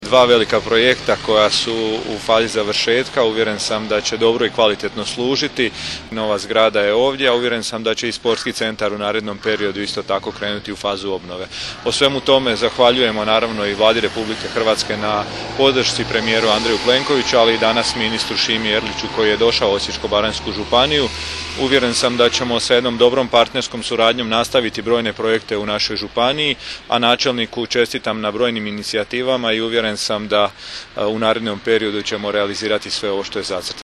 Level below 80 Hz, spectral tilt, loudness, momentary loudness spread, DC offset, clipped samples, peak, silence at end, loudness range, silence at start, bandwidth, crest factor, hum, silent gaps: -44 dBFS; -3 dB/octave; -17 LUFS; 8 LU; under 0.1%; under 0.1%; 0 dBFS; 0.15 s; 4 LU; 0 s; 13 kHz; 18 dB; none; none